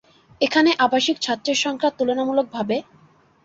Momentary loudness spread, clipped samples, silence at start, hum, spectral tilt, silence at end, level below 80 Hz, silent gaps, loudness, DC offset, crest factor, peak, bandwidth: 8 LU; under 0.1%; 0.4 s; none; -3 dB/octave; 0.6 s; -66 dBFS; none; -20 LUFS; under 0.1%; 18 dB; -4 dBFS; 7.8 kHz